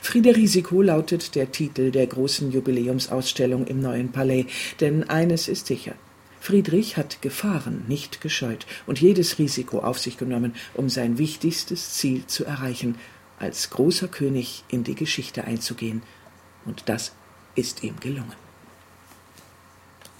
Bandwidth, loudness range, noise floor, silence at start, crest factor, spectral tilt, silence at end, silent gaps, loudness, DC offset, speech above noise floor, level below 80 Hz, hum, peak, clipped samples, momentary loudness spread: 16.5 kHz; 8 LU; -52 dBFS; 0 s; 22 dB; -5 dB/octave; 1.8 s; none; -24 LUFS; under 0.1%; 28 dB; -60 dBFS; none; -2 dBFS; under 0.1%; 12 LU